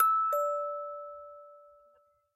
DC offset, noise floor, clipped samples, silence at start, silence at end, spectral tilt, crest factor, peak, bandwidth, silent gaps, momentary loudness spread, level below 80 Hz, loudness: under 0.1%; -67 dBFS; under 0.1%; 0 s; 0.75 s; 0 dB/octave; 20 dB; -14 dBFS; 15 kHz; none; 22 LU; -86 dBFS; -31 LUFS